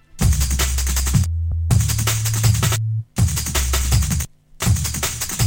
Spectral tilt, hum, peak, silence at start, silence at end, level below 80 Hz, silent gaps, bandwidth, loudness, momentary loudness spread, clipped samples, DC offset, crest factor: -3.5 dB/octave; none; -4 dBFS; 0.15 s; 0 s; -24 dBFS; none; 17 kHz; -19 LUFS; 5 LU; under 0.1%; under 0.1%; 14 dB